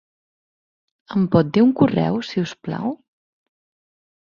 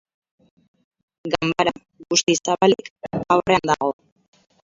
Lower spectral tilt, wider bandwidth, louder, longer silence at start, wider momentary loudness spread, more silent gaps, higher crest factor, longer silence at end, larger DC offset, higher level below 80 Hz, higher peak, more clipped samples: first, -8 dB/octave vs -3.5 dB/octave; about the same, 7.2 kHz vs 7.8 kHz; about the same, -20 LUFS vs -20 LUFS; second, 1.1 s vs 1.25 s; about the same, 11 LU vs 13 LU; second, none vs 2.90-2.96 s; about the same, 20 dB vs 22 dB; first, 1.3 s vs 0.75 s; neither; about the same, -56 dBFS vs -56 dBFS; about the same, -2 dBFS vs 0 dBFS; neither